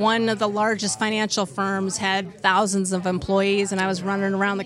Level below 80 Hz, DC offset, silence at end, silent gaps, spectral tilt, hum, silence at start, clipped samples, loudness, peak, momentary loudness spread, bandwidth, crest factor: -54 dBFS; under 0.1%; 0 s; none; -4 dB/octave; none; 0 s; under 0.1%; -22 LUFS; -4 dBFS; 4 LU; 13 kHz; 18 dB